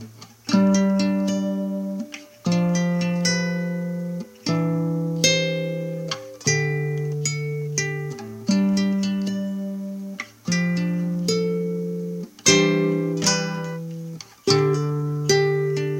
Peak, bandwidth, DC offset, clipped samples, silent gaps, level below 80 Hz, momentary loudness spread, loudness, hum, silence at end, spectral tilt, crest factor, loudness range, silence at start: 0 dBFS; 16.5 kHz; under 0.1%; under 0.1%; none; -64 dBFS; 13 LU; -23 LUFS; none; 0 s; -4.5 dB/octave; 22 dB; 3 LU; 0 s